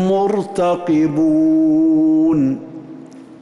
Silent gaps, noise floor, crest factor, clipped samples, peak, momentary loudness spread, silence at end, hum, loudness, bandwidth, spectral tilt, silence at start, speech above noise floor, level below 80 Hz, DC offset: none; -36 dBFS; 8 dB; under 0.1%; -8 dBFS; 15 LU; 0.05 s; none; -15 LUFS; 11 kHz; -8 dB/octave; 0 s; 22 dB; -54 dBFS; under 0.1%